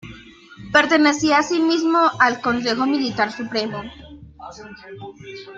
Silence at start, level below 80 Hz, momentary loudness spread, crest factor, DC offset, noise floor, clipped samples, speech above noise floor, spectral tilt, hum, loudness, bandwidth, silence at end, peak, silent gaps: 0.05 s; -54 dBFS; 22 LU; 20 dB; under 0.1%; -43 dBFS; under 0.1%; 23 dB; -3.5 dB/octave; none; -18 LUFS; 7.8 kHz; 0 s; -2 dBFS; none